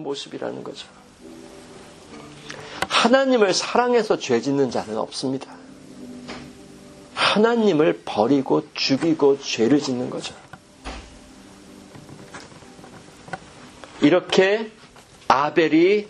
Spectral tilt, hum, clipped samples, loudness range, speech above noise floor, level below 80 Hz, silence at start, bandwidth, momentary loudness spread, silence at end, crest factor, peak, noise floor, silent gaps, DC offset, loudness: -4.5 dB/octave; none; under 0.1%; 10 LU; 27 dB; -56 dBFS; 0 s; 12.5 kHz; 24 LU; 0 s; 22 dB; 0 dBFS; -47 dBFS; none; under 0.1%; -20 LUFS